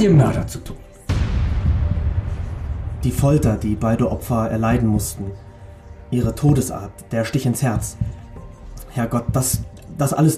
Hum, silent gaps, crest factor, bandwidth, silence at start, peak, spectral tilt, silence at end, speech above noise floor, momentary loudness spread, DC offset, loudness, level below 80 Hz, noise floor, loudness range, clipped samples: none; none; 14 dB; 15.5 kHz; 0 s; -6 dBFS; -6.5 dB/octave; 0 s; 20 dB; 20 LU; under 0.1%; -21 LUFS; -28 dBFS; -39 dBFS; 2 LU; under 0.1%